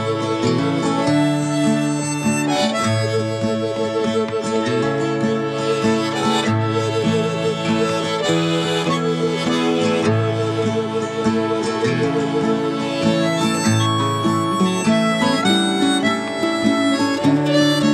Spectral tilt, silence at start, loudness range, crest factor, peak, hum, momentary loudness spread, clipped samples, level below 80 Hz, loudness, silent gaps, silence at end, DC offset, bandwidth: -5 dB/octave; 0 s; 2 LU; 14 dB; -4 dBFS; none; 4 LU; under 0.1%; -58 dBFS; -19 LUFS; none; 0 s; under 0.1%; 14 kHz